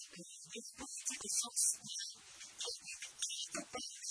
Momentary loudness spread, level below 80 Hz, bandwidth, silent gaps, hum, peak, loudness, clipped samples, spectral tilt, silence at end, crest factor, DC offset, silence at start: 16 LU; -80 dBFS; 11 kHz; none; none; -22 dBFS; -39 LUFS; under 0.1%; 0.5 dB/octave; 0 s; 22 dB; under 0.1%; 0 s